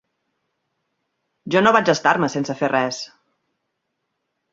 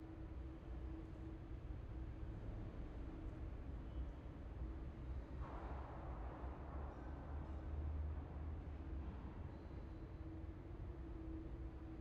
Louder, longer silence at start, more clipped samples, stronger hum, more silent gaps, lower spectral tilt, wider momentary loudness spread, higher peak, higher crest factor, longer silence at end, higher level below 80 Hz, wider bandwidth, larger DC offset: first, -18 LUFS vs -52 LUFS; first, 1.45 s vs 0 s; neither; neither; neither; second, -4.5 dB/octave vs -8.5 dB/octave; first, 11 LU vs 4 LU; first, -2 dBFS vs -36 dBFS; first, 22 dB vs 14 dB; first, 1.45 s vs 0 s; second, -64 dBFS vs -52 dBFS; first, 7.8 kHz vs 5.2 kHz; neither